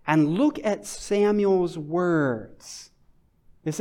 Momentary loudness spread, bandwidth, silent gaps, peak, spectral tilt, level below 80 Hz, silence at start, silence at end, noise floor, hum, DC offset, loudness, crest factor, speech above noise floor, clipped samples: 19 LU; 14.5 kHz; none; -8 dBFS; -6 dB/octave; -56 dBFS; 0.05 s; 0 s; -59 dBFS; none; under 0.1%; -24 LUFS; 18 dB; 36 dB; under 0.1%